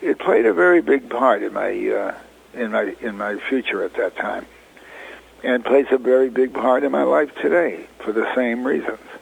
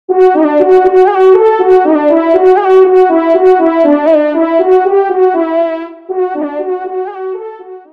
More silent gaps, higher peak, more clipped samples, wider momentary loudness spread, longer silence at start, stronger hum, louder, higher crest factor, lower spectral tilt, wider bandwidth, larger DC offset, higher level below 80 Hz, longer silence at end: neither; about the same, -2 dBFS vs 0 dBFS; second, under 0.1% vs 2%; about the same, 12 LU vs 13 LU; about the same, 0 s vs 0.1 s; neither; second, -19 LUFS vs -9 LUFS; first, 18 dB vs 8 dB; about the same, -6 dB/octave vs -6 dB/octave; first, 10 kHz vs 5 kHz; neither; second, -58 dBFS vs -52 dBFS; about the same, 0.05 s vs 0.15 s